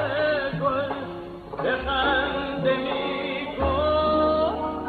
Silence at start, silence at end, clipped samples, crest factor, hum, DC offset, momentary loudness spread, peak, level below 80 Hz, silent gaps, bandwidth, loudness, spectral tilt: 0 s; 0 s; under 0.1%; 14 dB; none; under 0.1%; 9 LU; -10 dBFS; -40 dBFS; none; 4.7 kHz; -24 LUFS; -7.5 dB/octave